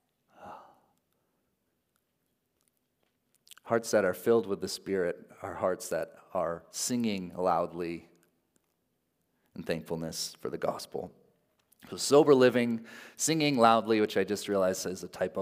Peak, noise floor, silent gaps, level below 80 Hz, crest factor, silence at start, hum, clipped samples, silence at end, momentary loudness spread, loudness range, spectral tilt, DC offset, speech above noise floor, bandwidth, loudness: -8 dBFS; -79 dBFS; none; -74 dBFS; 24 dB; 0.4 s; none; under 0.1%; 0 s; 18 LU; 12 LU; -4 dB/octave; under 0.1%; 50 dB; 16 kHz; -29 LUFS